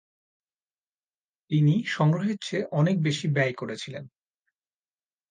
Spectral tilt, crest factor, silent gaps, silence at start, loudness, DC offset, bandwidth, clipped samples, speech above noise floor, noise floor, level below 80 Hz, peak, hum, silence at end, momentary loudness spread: -6.5 dB/octave; 18 dB; none; 1.5 s; -25 LUFS; under 0.1%; 9.4 kHz; under 0.1%; over 65 dB; under -90 dBFS; -72 dBFS; -10 dBFS; none; 1.25 s; 12 LU